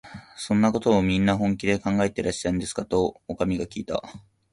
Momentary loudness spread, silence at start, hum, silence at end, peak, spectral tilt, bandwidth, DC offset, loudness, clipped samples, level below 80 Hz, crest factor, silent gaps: 10 LU; 0.05 s; none; 0.35 s; -8 dBFS; -6 dB/octave; 11.5 kHz; under 0.1%; -24 LUFS; under 0.1%; -46 dBFS; 18 dB; none